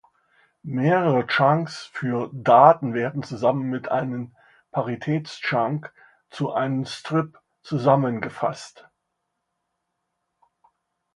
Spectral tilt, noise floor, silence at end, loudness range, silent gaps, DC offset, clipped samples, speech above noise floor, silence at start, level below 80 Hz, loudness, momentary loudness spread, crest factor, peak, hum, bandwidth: -7 dB/octave; -78 dBFS; 2.45 s; 7 LU; none; under 0.1%; under 0.1%; 56 dB; 0.65 s; -68 dBFS; -22 LUFS; 14 LU; 22 dB; 0 dBFS; none; 11 kHz